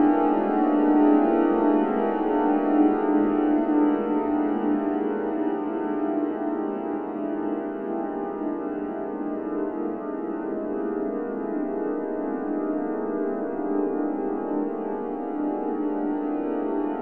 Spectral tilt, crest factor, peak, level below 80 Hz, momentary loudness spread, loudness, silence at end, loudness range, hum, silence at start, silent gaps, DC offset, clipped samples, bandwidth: -10.5 dB/octave; 16 dB; -8 dBFS; -60 dBFS; 9 LU; -25 LUFS; 0 s; 8 LU; none; 0 s; none; 0.3%; under 0.1%; 3.3 kHz